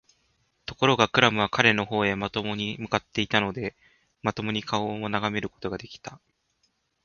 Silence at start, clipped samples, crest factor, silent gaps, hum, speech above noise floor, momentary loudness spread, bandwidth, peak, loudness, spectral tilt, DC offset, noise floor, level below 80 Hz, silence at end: 0.7 s; under 0.1%; 28 dB; none; none; 46 dB; 16 LU; 7.2 kHz; 0 dBFS; -25 LUFS; -4.5 dB/octave; under 0.1%; -72 dBFS; -56 dBFS; 0.9 s